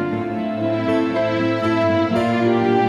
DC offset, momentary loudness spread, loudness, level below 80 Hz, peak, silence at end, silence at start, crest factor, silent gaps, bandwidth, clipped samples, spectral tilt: under 0.1%; 5 LU; -19 LUFS; -56 dBFS; -6 dBFS; 0 s; 0 s; 14 dB; none; 11 kHz; under 0.1%; -7.5 dB/octave